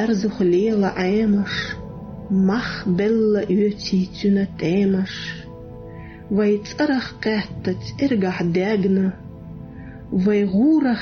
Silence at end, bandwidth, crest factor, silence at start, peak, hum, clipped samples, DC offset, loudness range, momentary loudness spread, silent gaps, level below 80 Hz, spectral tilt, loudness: 0 s; 6.6 kHz; 10 dB; 0 s; -10 dBFS; none; under 0.1%; under 0.1%; 3 LU; 19 LU; none; -46 dBFS; -7 dB/octave; -20 LUFS